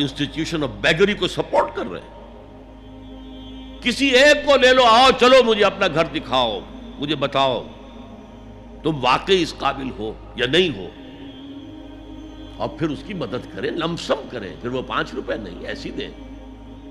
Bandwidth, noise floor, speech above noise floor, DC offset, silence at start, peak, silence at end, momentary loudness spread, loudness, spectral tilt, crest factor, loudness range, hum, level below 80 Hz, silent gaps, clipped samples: 13 kHz; -41 dBFS; 21 dB; under 0.1%; 0 s; -4 dBFS; 0 s; 25 LU; -19 LUFS; -4 dB/octave; 18 dB; 12 LU; none; -42 dBFS; none; under 0.1%